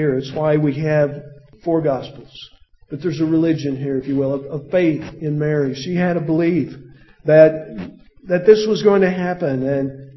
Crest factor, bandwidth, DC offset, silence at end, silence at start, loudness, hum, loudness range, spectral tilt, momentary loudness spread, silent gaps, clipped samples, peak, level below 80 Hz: 18 dB; 6.2 kHz; under 0.1%; 0.05 s; 0 s; -18 LUFS; none; 5 LU; -8 dB/octave; 15 LU; none; under 0.1%; 0 dBFS; -52 dBFS